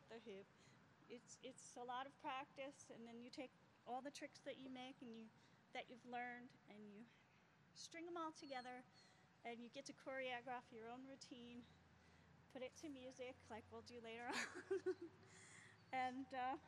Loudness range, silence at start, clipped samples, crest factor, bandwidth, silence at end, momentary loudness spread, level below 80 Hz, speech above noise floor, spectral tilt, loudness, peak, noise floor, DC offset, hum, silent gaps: 5 LU; 0 s; under 0.1%; 22 dB; 11.5 kHz; 0 s; 15 LU; under -90 dBFS; 20 dB; -3.5 dB/octave; -54 LUFS; -34 dBFS; -74 dBFS; under 0.1%; none; none